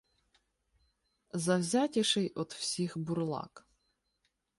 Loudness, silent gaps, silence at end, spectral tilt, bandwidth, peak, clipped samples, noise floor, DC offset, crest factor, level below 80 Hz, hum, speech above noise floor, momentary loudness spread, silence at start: -33 LUFS; none; 1 s; -4.5 dB/octave; 11.5 kHz; -16 dBFS; under 0.1%; -80 dBFS; under 0.1%; 20 dB; -74 dBFS; none; 48 dB; 11 LU; 1.35 s